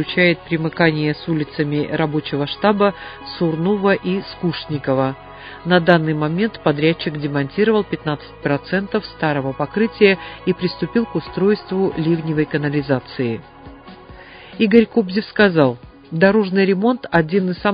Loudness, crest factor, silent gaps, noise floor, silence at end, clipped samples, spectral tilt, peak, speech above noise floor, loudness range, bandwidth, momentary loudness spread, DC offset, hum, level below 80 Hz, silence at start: -18 LUFS; 18 dB; none; -39 dBFS; 0 s; under 0.1%; -10 dB/octave; 0 dBFS; 21 dB; 3 LU; 5.2 kHz; 9 LU; under 0.1%; none; -48 dBFS; 0 s